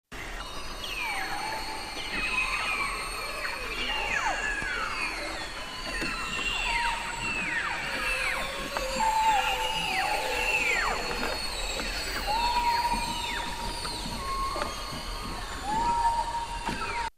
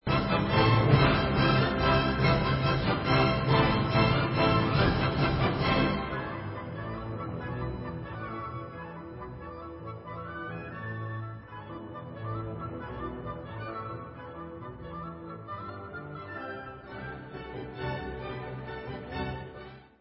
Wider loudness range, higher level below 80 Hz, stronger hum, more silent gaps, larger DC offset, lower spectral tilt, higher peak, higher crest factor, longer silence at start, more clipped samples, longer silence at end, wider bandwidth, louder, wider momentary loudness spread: second, 4 LU vs 15 LU; about the same, -42 dBFS vs -44 dBFS; neither; neither; neither; second, -2 dB/octave vs -10.5 dB/octave; second, -12 dBFS vs -8 dBFS; about the same, 18 dB vs 22 dB; about the same, 0.1 s vs 0.05 s; neither; second, 0.05 s vs 0.2 s; first, 15.5 kHz vs 5.8 kHz; about the same, -29 LUFS vs -29 LUFS; second, 9 LU vs 17 LU